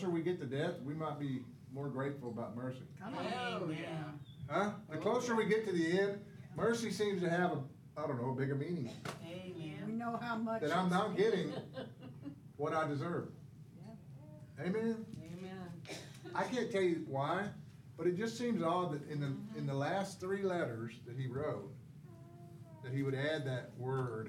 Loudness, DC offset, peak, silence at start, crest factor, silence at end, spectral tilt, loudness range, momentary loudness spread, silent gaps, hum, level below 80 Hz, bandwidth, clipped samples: -39 LUFS; under 0.1%; -20 dBFS; 0 s; 20 dB; 0 s; -6.5 dB/octave; 6 LU; 16 LU; none; none; -76 dBFS; 15.5 kHz; under 0.1%